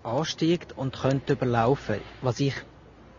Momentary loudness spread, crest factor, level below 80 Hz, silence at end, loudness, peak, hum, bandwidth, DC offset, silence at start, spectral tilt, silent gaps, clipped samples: 8 LU; 18 dB; -52 dBFS; 0.15 s; -27 LUFS; -8 dBFS; none; 7.4 kHz; under 0.1%; 0.05 s; -6.5 dB/octave; none; under 0.1%